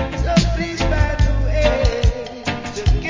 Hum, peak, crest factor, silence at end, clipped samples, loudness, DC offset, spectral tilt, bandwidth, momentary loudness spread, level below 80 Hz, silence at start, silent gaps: none; 0 dBFS; 18 dB; 0 s; under 0.1%; -19 LUFS; under 0.1%; -6 dB/octave; 7.6 kHz; 7 LU; -20 dBFS; 0 s; none